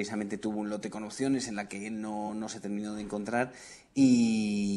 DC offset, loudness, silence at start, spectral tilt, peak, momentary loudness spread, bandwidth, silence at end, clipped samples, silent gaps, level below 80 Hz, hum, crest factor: under 0.1%; -31 LUFS; 0 s; -5 dB/octave; -14 dBFS; 12 LU; 11.5 kHz; 0 s; under 0.1%; none; -64 dBFS; none; 18 dB